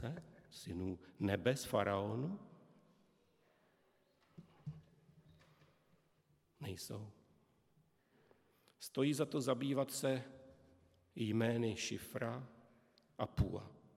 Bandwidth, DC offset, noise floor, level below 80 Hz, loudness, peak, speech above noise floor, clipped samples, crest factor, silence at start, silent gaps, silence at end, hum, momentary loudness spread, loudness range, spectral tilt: 16.5 kHz; under 0.1%; -76 dBFS; -62 dBFS; -40 LUFS; -18 dBFS; 36 dB; under 0.1%; 24 dB; 0 s; none; 0.2 s; none; 17 LU; 21 LU; -5.5 dB/octave